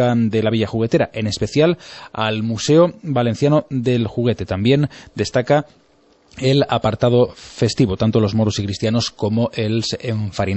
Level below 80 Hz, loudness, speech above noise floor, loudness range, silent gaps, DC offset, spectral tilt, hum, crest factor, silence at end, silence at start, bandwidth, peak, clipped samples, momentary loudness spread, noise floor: -46 dBFS; -18 LUFS; 36 dB; 1 LU; none; under 0.1%; -6.5 dB/octave; none; 16 dB; 0 s; 0 s; 8.4 kHz; -2 dBFS; under 0.1%; 6 LU; -54 dBFS